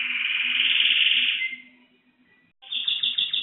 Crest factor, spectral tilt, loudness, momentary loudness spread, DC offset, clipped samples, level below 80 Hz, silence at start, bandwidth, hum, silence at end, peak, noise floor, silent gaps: 18 dB; 6 dB/octave; -21 LUFS; 12 LU; under 0.1%; under 0.1%; -74 dBFS; 0 s; 4.3 kHz; none; 0 s; -8 dBFS; -62 dBFS; none